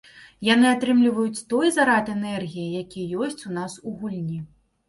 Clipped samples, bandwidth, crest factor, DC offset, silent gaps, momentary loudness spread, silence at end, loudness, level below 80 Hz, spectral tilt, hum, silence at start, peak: under 0.1%; 11.5 kHz; 18 dB; under 0.1%; none; 13 LU; 0.45 s; -23 LUFS; -62 dBFS; -5 dB/octave; none; 0.15 s; -6 dBFS